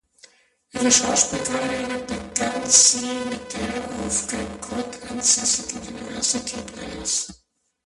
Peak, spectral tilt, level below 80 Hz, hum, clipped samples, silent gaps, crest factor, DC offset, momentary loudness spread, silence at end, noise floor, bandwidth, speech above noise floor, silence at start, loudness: 0 dBFS; -1 dB/octave; -50 dBFS; none; under 0.1%; none; 24 dB; under 0.1%; 16 LU; 0.55 s; -54 dBFS; 11.5 kHz; 31 dB; 0.75 s; -21 LUFS